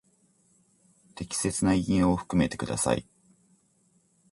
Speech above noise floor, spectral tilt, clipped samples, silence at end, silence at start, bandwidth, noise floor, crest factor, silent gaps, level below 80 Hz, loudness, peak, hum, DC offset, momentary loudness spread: 41 dB; -5 dB/octave; under 0.1%; 1.3 s; 1.15 s; 11.5 kHz; -67 dBFS; 20 dB; none; -48 dBFS; -27 LUFS; -10 dBFS; none; under 0.1%; 7 LU